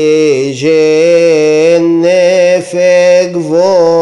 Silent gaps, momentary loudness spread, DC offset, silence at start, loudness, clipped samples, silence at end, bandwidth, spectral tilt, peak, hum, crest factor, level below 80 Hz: none; 4 LU; under 0.1%; 0 s; -8 LUFS; under 0.1%; 0 s; 11.5 kHz; -5 dB/octave; 0 dBFS; none; 8 dB; -58 dBFS